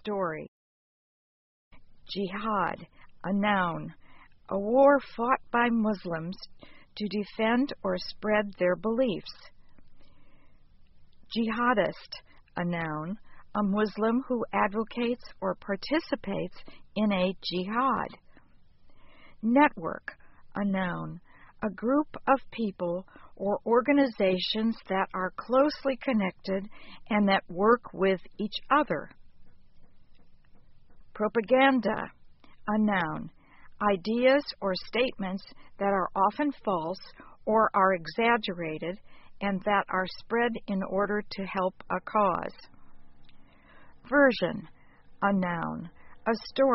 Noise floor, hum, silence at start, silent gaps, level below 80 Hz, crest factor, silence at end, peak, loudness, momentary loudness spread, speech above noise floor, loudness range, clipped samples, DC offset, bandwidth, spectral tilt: -55 dBFS; none; 0.05 s; 0.48-1.71 s; -56 dBFS; 22 dB; 0 s; -8 dBFS; -28 LUFS; 15 LU; 27 dB; 5 LU; under 0.1%; under 0.1%; 5.8 kHz; -4 dB/octave